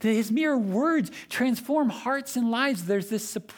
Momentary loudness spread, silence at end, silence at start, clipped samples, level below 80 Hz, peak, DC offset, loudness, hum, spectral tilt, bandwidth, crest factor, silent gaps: 5 LU; 0 s; 0 s; under 0.1%; -72 dBFS; -10 dBFS; under 0.1%; -26 LUFS; none; -5 dB/octave; 19.5 kHz; 16 dB; none